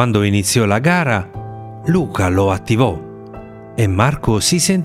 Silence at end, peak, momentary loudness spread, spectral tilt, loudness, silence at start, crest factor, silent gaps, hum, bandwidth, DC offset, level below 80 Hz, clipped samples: 0 s; 0 dBFS; 17 LU; -5 dB/octave; -16 LUFS; 0 s; 16 dB; none; none; 16 kHz; under 0.1%; -40 dBFS; under 0.1%